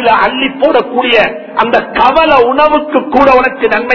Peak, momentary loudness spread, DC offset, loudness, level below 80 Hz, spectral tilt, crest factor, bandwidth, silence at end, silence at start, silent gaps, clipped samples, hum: 0 dBFS; 5 LU; under 0.1%; -9 LUFS; -38 dBFS; -5.5 dB/octave; 8 dB; 6 kHz; 0 s; 0 s; none; 1%; none